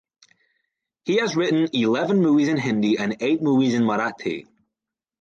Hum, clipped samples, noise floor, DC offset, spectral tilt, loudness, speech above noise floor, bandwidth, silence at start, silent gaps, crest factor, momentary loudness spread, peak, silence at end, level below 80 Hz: none; under 0.1%; -87 dBFS; under 0.1%; -6 dB/octave; -21 LUFS; 66 dB; 7.6 kHz; 1.05 s; none; 14 dB; 9 LU; -8 dBFS; 0.8 s; -68 dBFS